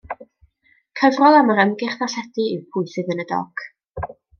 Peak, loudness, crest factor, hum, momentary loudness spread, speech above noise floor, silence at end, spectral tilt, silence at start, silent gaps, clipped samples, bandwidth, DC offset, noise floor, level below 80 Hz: -2 dBFS; -19 LUFS; 18 dB; none; 21 LU; 43 dB; 0.3 s; -5.5 dB/octave; 0.05 s; none; under 0.1%; 6.8 kHz; under 0.1%; -61 dBFS; -52 dBFS